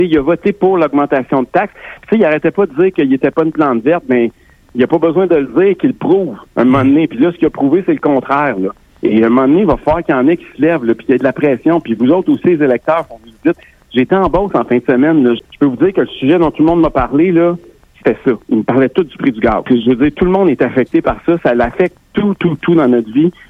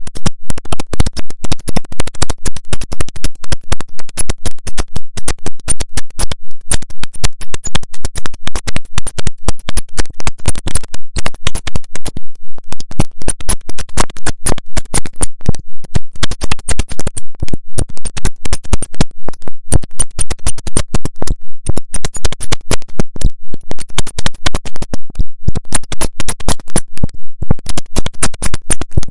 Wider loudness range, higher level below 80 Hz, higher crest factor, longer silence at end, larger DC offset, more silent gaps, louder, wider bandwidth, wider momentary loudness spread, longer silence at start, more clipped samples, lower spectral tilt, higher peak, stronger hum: about the same, 1 LU vs 3 LU; second, -38 dBFS vs -22 dBFS; about the same, 10 dB vs 10 dB; first, 0.2 s vs 0 s; second, under 0.1% vs 40%; neither; first, -12 LUFS vs -21 LUFS; second, 4.8 kHz vs 11.5 kHz; about the same, 6 LU vs 8 LU; about the same, 0 s vs 0 s; second, under 0.1% vs 0.2%; first, -9 dB/octave vs -3.5 dB/octave; about the same, 0 dBFS vs 0 dBFS; neither